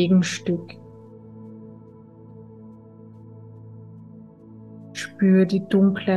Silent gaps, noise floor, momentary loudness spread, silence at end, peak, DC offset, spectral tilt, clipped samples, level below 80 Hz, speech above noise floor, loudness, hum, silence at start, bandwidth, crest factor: none; -46 dBFS; 26 LU; 0 s; -8 dBFS; under 0.1%; -6.5 dB/octave; under 0.1%; -64 dBFS; 26 dB; -21 LUFS; none; 0 s; 9.4 kHz; 16 dB